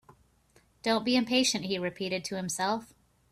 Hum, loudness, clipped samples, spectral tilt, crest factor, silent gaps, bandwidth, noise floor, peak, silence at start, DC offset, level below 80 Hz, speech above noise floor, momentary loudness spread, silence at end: none; -29 LUFS; under 0.1%; -3 dB/octave; 18 dB; none; 14.5 kHz; -65 dBFS; -12 dBFS; 0.85 s; under 0.1%; -66 dBFS; 36 dB; 8 LU; 0.45 s